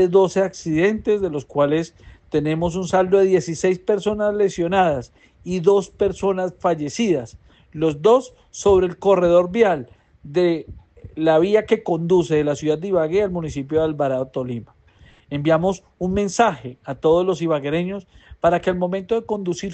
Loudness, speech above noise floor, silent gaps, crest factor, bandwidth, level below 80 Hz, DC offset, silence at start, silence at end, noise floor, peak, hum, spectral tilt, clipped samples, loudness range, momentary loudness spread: -20 LUFS; 32 dB; none; 16 dB; 8.6 kHz; -46 dBFS; under 0.1%; 0 s; 0 s; -51 dBFS; -4 dBFS; none; -6 dB/octave; under 0.1%; 3 LU; 10 LU